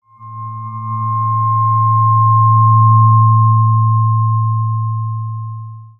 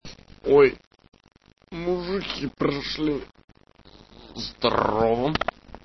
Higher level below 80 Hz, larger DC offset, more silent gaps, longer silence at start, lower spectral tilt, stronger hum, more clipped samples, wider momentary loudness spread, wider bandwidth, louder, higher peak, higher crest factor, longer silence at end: second, -56 dBFS vs -48 dBFS; second, under 0.1% vs 0.1%; second, none vs 0.87-0.91 s, 3.44-3.48 s; first, 0.2 s vs 0.05 s; first, -13 dB/octave vs -6 dB/octave; neither; neither; about the same, 17 LU vs 17 LU; second, 2.2 kHz vs 6.2 kHz; first, -12 LUFS vs -24 LUFS; first, -2 dBFS vs -6 dBFS; second, 12 dB vs 20 dB; about the same, 0.1 s vs 0.05 s